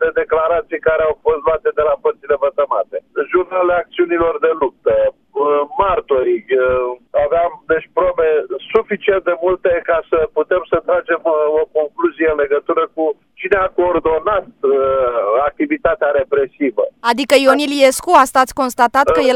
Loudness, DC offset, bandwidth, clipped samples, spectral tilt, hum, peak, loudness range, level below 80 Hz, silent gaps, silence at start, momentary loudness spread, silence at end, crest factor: -16 LUFS; under 0.1%; 16 kHz; under 0.1%; -4 dB/octave; none; 0 dBFS; 3 LU; -44 dBFS; none; 0 s; 6 LU; 0 s; 16 dB